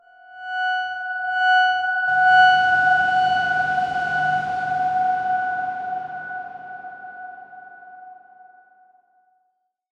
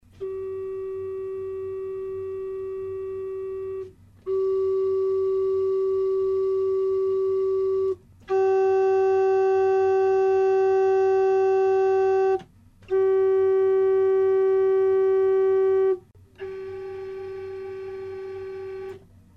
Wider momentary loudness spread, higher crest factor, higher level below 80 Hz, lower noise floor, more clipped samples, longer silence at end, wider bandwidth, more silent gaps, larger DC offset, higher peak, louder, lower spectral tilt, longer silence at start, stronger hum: first, 21 LU vs 14 LU; first, 16 dB vs 8 dB; about the same, -62 dBFS vs -62 dBFS; first, -71 dBFS vs -49 dBFS; neither; first, 1.8 s vs 0.4 s; first, 7.8 kHz vs 6 kHz; neither; neither; first, -6 dBFS vs -16 dBFS; first, -19 LUFS vs -23 LUFS; second, -3 dB/octave vs -7.5 dB/octave; about the same, 0.3 s vs 0.2 s; neither